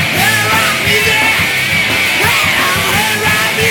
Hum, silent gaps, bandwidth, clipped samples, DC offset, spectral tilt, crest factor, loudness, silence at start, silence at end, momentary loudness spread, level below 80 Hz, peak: none; none; 19.5 kHz; under 0.1%; under 0.1%; -2 dB/octave; 12 dB; -10 LUFS; 0 s; 0 s; 2 LU; -38 dBFS; 0 dBFS